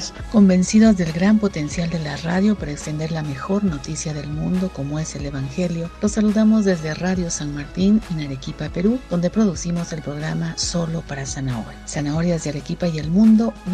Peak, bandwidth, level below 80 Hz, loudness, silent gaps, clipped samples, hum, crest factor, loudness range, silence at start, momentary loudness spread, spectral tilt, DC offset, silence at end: -4 dBFS; 9.8 kHz; -38 dBFS; -20 LUFS; none; under 0.1%; none; 16 dB; 5 LU; 0 s; 12 LU; -6 dB/octave; under 0.1%; 0 s